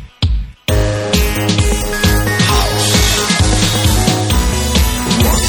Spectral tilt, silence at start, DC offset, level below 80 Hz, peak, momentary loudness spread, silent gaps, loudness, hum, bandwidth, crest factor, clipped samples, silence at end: -4 dB/octave; 0 s; under 0.1%; -18 dBFS; 0 dBFS; 5 LU; none; -13 LUFS; none; 18 kHz; 12 dB; under 0.1%; 0 s